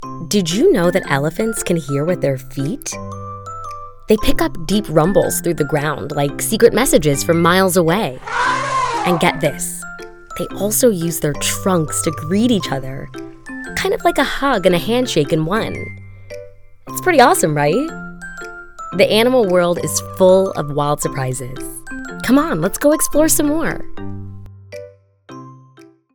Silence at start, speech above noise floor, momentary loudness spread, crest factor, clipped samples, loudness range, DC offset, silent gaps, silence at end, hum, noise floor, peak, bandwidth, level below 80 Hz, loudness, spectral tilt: 0 s; 30 dB; 19 LU; 16 dB; under 0.1%; 4 LU; under 0.1%; none; 0.35 s; none; -46 dBFS; 0 dBFS; 19 kHz; -34 dBFS; -16 LUFS; -4.5 dB/octave